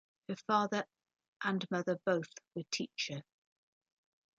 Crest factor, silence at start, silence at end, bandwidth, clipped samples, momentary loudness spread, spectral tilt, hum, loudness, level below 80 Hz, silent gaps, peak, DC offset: 20 dB; 0.3 s; 1.15 s; 9 kHz; under 0.1%; 13 LU; -4.5 dB/octave; none; -37 LUFS; -84 dBFS; 1.28-1.40 s; -18 dBFS; under 0.1%